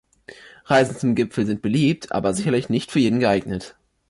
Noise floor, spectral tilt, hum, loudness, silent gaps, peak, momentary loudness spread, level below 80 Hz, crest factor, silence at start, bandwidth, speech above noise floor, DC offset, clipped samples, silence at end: -45 dBFS; -6 dB/octave; none; -21 LUFS; none; -6 dBFS; 5 LU; -52 dBFS; 14 dB; 0.3 s; 11.5 kHz; 25 dB; under 0.1%; under 0.1%; 0.4 s